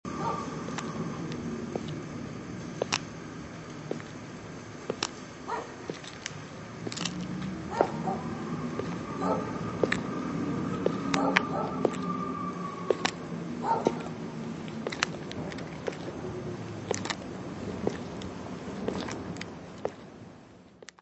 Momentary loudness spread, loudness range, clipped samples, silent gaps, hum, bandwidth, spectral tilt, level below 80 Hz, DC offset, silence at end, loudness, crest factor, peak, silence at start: 12 LU; 7 LU; under 0.1%; none; none; 8.2 kHz; -5 dB/octave; -58 dBFS; under 0.1%; 0.1 s; -34 LUFS; 32 dB; 0 dBFS; 0.05 s